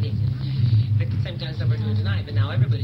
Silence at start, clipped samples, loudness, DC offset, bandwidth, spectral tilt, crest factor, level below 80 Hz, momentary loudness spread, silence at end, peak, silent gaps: 0 s; under 0.1%; -23 LUFS; under 0.1%; 5.6 kHz; -9 dB/octave; 12 dB; -42 dBFS; 5 LU; 0 s; -10 dBFS; none